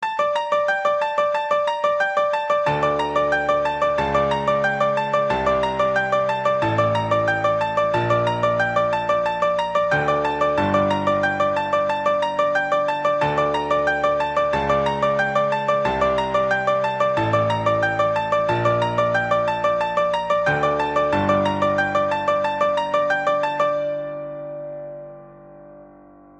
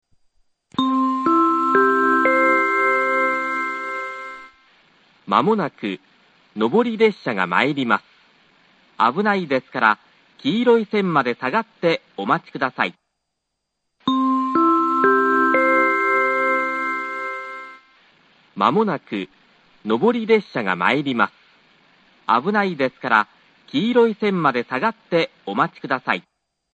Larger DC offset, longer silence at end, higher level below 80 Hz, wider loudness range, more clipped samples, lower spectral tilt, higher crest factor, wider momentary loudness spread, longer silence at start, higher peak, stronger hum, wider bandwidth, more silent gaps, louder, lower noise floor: neither; about the same, 0.55 s vs 0.55 s; first, -48 dBFS vs -68 dBFS; second, 1 LU vs 6 LU; neither; about the same, -6 dB/octave vs -6.5 dB/octave; second, 14 dB vs 20 dB; second, 2 LU vs 12 LU; second, 0 s vs 0.8 s; second, -6 dBFS vs 0 dBFS; neither; about the same, 8.8 kHz vs 8.6 kHz; neither; about the same, -20 LUFS vs -19 LUFS; second, -47 dBFS vs -78 dBFS